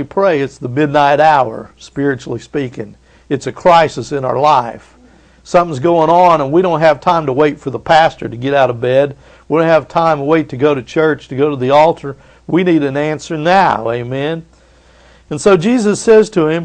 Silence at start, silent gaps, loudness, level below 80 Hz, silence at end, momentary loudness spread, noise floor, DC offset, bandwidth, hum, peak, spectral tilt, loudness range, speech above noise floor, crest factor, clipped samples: 0 s; none; -13 LUFS; -46 dBFS; 0 s; 12 LU; -46 dBFS; under 0.1%; 9.8 kHz; none; 0 dBFS; -6 dB/octave; 4 LU; 33 dB; 12 dB; under 0.1%